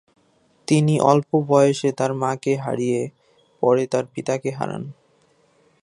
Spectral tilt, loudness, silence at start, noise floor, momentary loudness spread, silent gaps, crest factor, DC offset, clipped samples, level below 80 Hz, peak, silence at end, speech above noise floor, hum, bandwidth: -6.5 dB/octave; -21 LUFS; 0.7 s; -61 dBFS; 12 LU; none; 20 dB; under 0.1%; under 0.1%; -66 dBFS; -2 dBFS; 0.9 s; 41 dB; none; 11.5 kHz